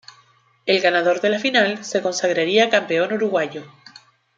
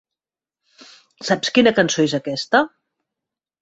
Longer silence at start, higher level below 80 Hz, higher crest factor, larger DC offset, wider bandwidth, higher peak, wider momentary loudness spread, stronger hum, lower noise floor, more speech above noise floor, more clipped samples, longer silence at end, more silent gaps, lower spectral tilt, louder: second, 0.65 s vs 1.2 s; second, -72 dBFS vs -62 dBFS; about the same, 18 dB vs 20 dB; neither; about the same, 9 kHz vs 8.2 kHz; about the same, -2 dBFS vs -2 dBFS; second, 7 LU vs 10 LU; neither; second, -57 dBFS vs -89 dBFS; second, 38 dB vs 71 dB; neither; second, 0.7 s vs 0.95 s; neither; about the same, -3.5 dB/octave vs -4 dB/octave; about the same, -19 LUFS vs -18 LUFS